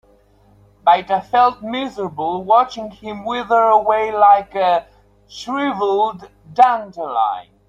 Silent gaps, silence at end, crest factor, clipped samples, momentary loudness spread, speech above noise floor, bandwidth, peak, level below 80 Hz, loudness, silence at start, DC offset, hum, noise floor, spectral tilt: none; 0.25 s; 16 dB; under 0.1%; 12 LU; 36 dB; 7.8 kHz; -2 dBFS; -56 dBFS; -17 LUFS; 0.85 s; under 0.1%; 50 Hz at -55 dBFS; -52 dBFS; -5 dB/octave